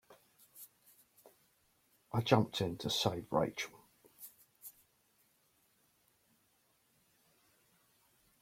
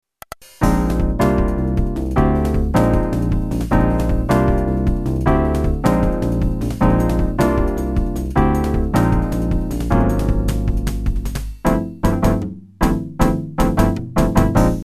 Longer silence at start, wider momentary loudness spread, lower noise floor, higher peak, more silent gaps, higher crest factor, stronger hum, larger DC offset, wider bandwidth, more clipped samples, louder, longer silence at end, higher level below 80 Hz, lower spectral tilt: second, 0.1 s vs 0.6 s; first, 24 LU vs 5 LU; first, -75 dBFS vs -39 dBFS; second, -12 dBFS vs -2 dBFS; neither; first, 30 dB vs 14 dB; neither; neither; first, 16.5 kHz vs 14 kHz; neither; second, -35 LUFS vs -18 LUFS; first, 3.7 s vs 0 s; second, -72 dBFS vs -22 dBFS; second, -5 dB/octave vs -7.5 dB/octave